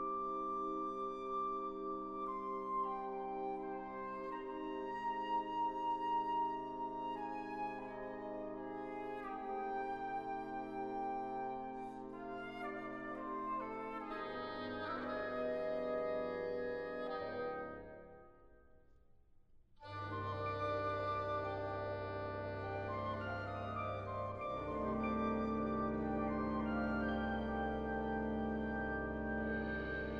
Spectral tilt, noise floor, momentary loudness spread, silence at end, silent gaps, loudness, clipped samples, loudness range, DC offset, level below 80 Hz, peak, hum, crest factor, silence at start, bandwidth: -8 dB/octave; -65 dBFS; 7 LU; 0 s; none; -41 LUFS; under 0.1%; 5 LU; under 0.1%; -58 dBFS; -26 dBFS; none; 14 dB; 0 s; 7.4 kHz